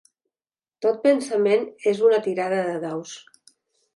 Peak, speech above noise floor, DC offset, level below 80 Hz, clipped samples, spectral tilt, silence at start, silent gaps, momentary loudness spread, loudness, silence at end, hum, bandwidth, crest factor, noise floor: -6 dBFS; over 69 dB; under 0.1%; -78 dBFS; under 0.1%; -5 dB/octave; 0.8 s; none; 13 LU; -22 LUFS; 0.75 s; none; 11.5 kHz; 16 dB; under -90 dBFS